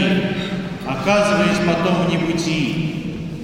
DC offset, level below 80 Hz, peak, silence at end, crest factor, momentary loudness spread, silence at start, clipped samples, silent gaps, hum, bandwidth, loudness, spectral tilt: under 0.1%; -42 dBFS; -4 dBFS; 0 s; 16 dB; 9 LU; 0 s; under 0.1%; none; none; 15.5 kHz; -19 LUFS; -5.5 dB/octave